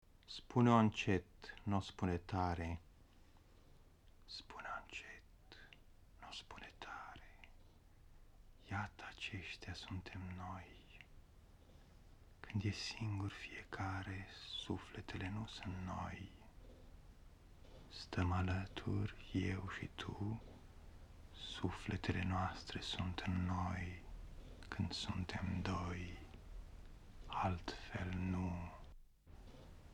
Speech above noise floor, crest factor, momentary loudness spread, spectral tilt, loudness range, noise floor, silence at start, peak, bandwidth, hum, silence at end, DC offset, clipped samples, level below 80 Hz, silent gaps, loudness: 23 dB; 28 dB; 21 LU; -6 dB/octave; 10 LU; -65 dBFS; 0.15 s; -18 dBFS; 10.5 kHz; none; 0 s; under 0.1%; under 0.1%; -60 dBFS; none; -43 LUFS